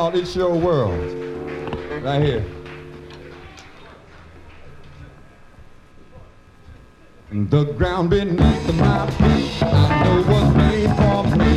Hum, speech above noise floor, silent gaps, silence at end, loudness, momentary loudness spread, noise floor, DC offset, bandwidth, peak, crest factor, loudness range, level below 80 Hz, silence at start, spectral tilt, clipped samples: none; 29 dB; none; 0 s; -18 LUFS; 20 LU; -46 dBFS; under 0.1%; 11 kHz; -2 dBFS; 18 dB; 18 LU; -30 dBFS; 0 s; -7.5 dB/octave; under 0.1%